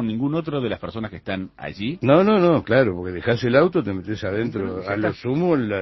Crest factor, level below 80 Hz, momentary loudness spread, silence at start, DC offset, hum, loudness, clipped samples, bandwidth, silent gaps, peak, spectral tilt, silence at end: 18 dB; -48 dBFS; 13 LU; 0 s; under 0.1%; none; -21 LUFS; under 0.1%; 6 kHz; none; -2 dBFS; -8.5 dB/octave; 0 s